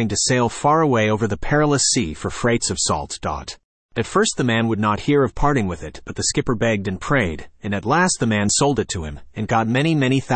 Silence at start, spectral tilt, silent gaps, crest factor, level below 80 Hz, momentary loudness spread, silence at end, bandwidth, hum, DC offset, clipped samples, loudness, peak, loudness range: 0 s; -4 dB/octave; 3.64-3.89 s; 14 dB; -38 dBFS; 10 LU; 0 s; 8.8 kHz; none; under 0.1%; under 0.1%; -19 LUFS; -4 dBFS; 2 LU